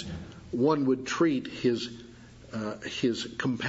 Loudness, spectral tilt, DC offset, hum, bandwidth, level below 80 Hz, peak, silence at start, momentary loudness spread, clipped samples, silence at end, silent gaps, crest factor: -29 LUFS; -5.5 dB/octave; under 0.1%; none; 8 kHz; -58 dBFS; -12 dBFS; 0 s; 15 LU; under 0.1%; 0 s; none; 18 dB